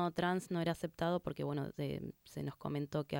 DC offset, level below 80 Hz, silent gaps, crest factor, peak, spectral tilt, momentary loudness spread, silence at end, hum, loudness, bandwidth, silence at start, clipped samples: under 0.1%; -66 dBFS; none; 16 dB; -22 dBFS; -6.5 dB/octave; 9 LU; 0 s; none; -39 LUFS; 17 kHz; 0 s; under 0.1%